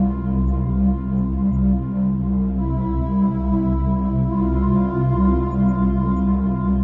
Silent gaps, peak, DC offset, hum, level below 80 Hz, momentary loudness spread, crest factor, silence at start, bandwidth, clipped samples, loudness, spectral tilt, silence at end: none; -8 dBFS; under 0.1%; none; -26 dBFS; 3 LU; 10 dB; 0 s; 3.1 kHz; under 0.1%; -20 LUFS; -12.5 dB/octave; 0 s